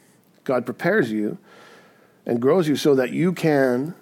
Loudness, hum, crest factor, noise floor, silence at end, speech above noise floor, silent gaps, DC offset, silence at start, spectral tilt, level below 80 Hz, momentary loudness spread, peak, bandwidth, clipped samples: -21 LUFS; none; 16 dB; -53 dBFS; 0.05 s; 33 dB; none; under 0.1%; 0.45 s; -6.5 dB/octave; -74 dBFS; 11 LU; -6 dBFS; 17 kHz; under 0.1%